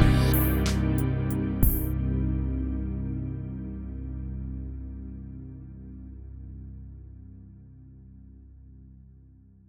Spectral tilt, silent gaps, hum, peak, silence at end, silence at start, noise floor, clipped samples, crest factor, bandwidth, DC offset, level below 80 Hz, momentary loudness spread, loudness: -6.5 dB/octave; none; none; -6 dBFS; 0.7 s; 0 s; -53 dBFS; under 0.1%; 24 dB; over 20 kHz; under 0.1%; -32 dBFS; 25 LU; -29 LUFS